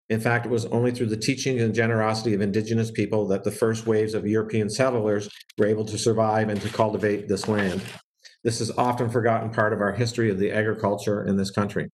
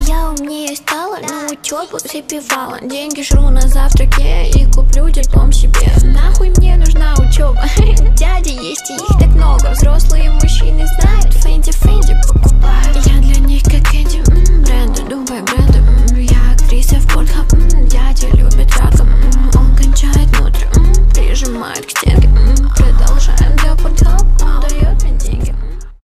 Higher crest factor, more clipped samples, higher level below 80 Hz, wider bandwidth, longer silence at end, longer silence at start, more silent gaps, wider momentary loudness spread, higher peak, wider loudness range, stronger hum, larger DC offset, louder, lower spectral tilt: first, 16 dB vs 8 dB; neither; second, -62 dBFS vs -8 dBFS; second, 12.5 kHz vs 14 kHz; about the same, 0.05 s vs 0.15 s; about the same, 0.1 s vs 0 s; first, 5.53-5.57 s, 8.04-8.14 s vs none; second, 4 LU vs 9 LU; second, -6 dBFS vs 0 dBFS; about the same, 1 LU vs 2 LU; neither; second, under 0.1% vs 0.7%; second, -24 LUFS vs -13 LUFS; about the same, -6 dB/octave vs -5 dB/octave